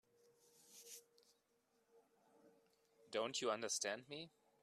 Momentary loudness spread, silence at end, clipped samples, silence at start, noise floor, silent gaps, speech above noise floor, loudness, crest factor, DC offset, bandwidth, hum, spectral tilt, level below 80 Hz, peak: 18 LU; 0.35 s; under 0.1%; 0.7 s; -82 dBFS; none; 37 dB; -44 LUFS; 24 dB; under 0.1%; 14 kHz; none; -1.5 dB/octave; under -90 dBFS; -26 dBFS